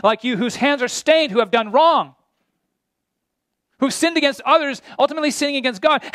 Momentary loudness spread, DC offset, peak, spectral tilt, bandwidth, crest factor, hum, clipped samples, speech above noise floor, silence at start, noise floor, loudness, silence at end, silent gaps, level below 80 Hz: 7 LU; under 0.1%; -2 dBFS; -3 dB/octave; 14.5 kHz; 16 dB; none; under 0.1%; 60 dB; 0.05 s; -78 dBFS; -18 LUFS; 0.05 s; none; -68 dBFS